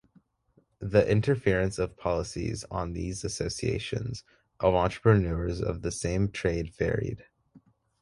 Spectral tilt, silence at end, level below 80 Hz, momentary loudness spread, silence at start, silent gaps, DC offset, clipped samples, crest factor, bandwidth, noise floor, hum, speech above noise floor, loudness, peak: -6 dB/octave; 0.45 s; -44 dBFS; 10 LU; 0.8 s; none; under 0.1%; under 0.1%; 20 dB; 11.5 kHz; -67 dBFS; none; 40 dB; -29 LUFS; -8 dBFS